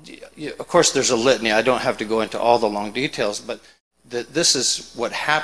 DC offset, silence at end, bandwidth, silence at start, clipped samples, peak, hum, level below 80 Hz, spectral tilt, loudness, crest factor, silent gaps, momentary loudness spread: 0.2%; 0 s; 13.5 kHz; 0.05 s; under 0.1%; 0 dBFS; none; -54 dBFS; -2 dB/octave; -19 LUFS; 20 dB; 3.81-3.91 s; 15 LU